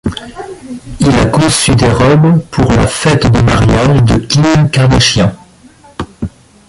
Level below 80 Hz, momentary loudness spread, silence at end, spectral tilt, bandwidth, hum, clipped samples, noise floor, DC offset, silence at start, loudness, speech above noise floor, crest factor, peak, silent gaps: -24 dBFS; 18 LU; 0.4 s; -5.5 dB/octave; 11.5 kHz; none; under 0.1%; -40 dBFS; under 0.1%; 0.05 s; -9 LUFS; 32 dB; 10 dB; 0 dBFS; none